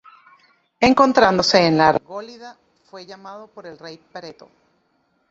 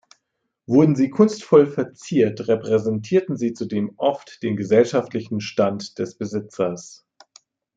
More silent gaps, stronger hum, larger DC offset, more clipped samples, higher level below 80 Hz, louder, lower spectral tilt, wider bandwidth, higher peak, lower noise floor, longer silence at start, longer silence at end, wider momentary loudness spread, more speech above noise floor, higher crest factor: neither; neither; neither; neither; first, -52 dBFS vs -66 dBFS; first, -15 LUFS vs -21 LUFS; second, -4.5 dB/octave vs -7 dB/octave; about the same, 8 kHz vs 7.8 kHz; about the same, 0 dBFS vs -2 dBFS; second, -66 dBFS vs -77 dBFS; about the same, 0.8 s vs 0.7 s; first, 1 s vs 0.85 s; first, 25 LU vs 12 LU; second, 47 dB vs 57 dB; about the same, 20 dB vs 18 dB